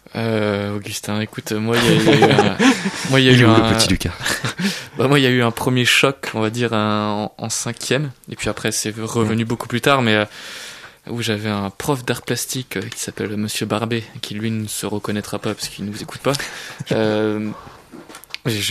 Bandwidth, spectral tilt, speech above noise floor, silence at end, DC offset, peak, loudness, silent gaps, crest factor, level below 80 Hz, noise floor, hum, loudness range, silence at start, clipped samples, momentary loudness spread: 14 kHz; -4.5 dB/octave; 21 dB; 0 s; under 0.1%; 0 dBFS; -19 LUFS; none; 18 dB; -44 dBFS; -40 dBFS; none; 9 LU; 0.15 s; under 0.1%; 13 LU